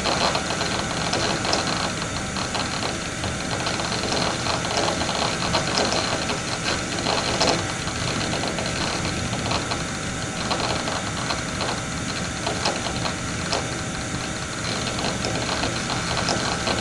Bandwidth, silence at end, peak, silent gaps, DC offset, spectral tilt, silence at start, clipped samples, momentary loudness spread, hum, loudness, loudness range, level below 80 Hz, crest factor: 11.5 kHz; 0 s; -4 dBFS; none; under 0.1%; -3 dB/octave; 0 s; under 0.1%; 5 LU; none; -24 LUFS; 3 LU; -42 dBFS; 22 dB